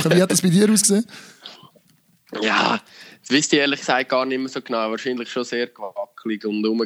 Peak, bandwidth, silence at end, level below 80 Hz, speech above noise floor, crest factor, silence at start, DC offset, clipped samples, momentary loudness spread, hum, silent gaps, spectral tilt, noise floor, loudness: -2 dBFS; 16 kHz; 0 s; -70 dBFS; 38 dB; 18 dB; 0 s; under 0.1%; under 0.1%; 18 LU; none; none; -4 dB/octave; -59 dBFS; -20 LUFS